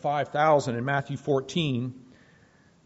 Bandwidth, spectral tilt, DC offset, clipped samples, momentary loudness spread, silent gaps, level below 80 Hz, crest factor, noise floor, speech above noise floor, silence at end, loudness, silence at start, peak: 8 kHz; -4.5 dB/octave; under 0.1%; under 0.1%; 7 LU; none; -64 dBFS; 18 dB; -59 dBFS; 33 dB; 0.85 s; -26 LUFS; 0.05 s; -10 dBFS